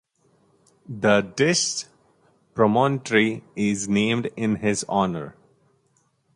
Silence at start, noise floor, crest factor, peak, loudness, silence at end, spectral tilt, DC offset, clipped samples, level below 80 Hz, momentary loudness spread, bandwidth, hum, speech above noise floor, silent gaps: 0.9 s; -66 dBFS; 18 dB; -6 dBFS; -22 LUFS; 1.05 s; -4.5 dB/octave; under 0.1%; under 0.1%; -58 dBFS; 13 LU; 11.5 kHz; none; 44 dB; none